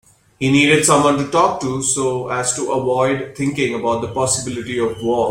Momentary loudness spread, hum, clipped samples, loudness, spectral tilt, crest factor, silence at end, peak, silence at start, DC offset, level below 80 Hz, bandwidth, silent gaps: 9 LU; none; under 0.1%; -17 LUFS; -4 dB/octave; 16 dB; 0 s; -2 dBFS; 0.4 s; under 0.1%; -50 dBFS; 16.5 kHz; none